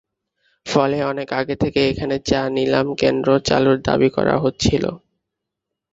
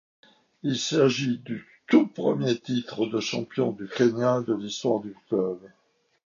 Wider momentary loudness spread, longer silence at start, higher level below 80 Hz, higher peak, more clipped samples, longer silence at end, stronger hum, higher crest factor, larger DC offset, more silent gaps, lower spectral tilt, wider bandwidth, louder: second, 6 LU vs 9 LU; about the same, 0.65 s vs 0.65 s; first, -42 dBFS vs -72 dBFS; first, 0 dBFS vs -6 dBFS; neither; first, 0.95 s vs 0.6 s; neither; about the same, 18 dB vs 20 dB; neither; neither; about the same, -5.5 dB/octave vs -5.5 dB/octave; about the same, 8 kHz vs 7.4 kHz; first, -19 LUFS vs -26 LUFS